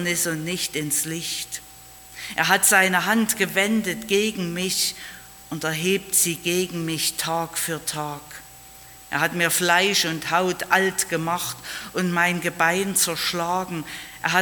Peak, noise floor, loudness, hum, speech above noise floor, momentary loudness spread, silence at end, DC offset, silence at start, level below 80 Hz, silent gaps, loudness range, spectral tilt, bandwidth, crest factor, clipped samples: -2 dBFS; -45 dBFS; -22 LUFS; none; 22 dB; 17 LU; 0 s; under 0.1%; 0 s; -58 dBFS; none; 3 LU; -2.5 dB/octave; 19 kHz; 22 dB; under 0.1%